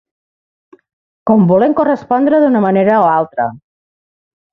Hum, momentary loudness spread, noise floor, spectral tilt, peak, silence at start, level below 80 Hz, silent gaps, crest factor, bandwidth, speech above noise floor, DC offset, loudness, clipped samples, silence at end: none; 9 LU; under -90 dBFS; -10.5 dB/octave; -2 dBFS; 1.25 s; -54 dBFS; none; 12 dB; 5.6 kHz; over 79 dB; under 0.1%; -12 LUFS; under 0.1%; 0.95 s